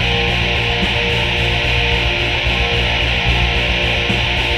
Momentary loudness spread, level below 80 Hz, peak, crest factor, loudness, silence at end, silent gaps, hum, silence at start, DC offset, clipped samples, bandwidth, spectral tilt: 1 LU; -22 dBFS; -2 dBFS; 14 dB; -15 LUFS; 0 s; none; none; 0 s; under 0.1%; under 0.1%; 13.5 kHz; -4.5 dB/octave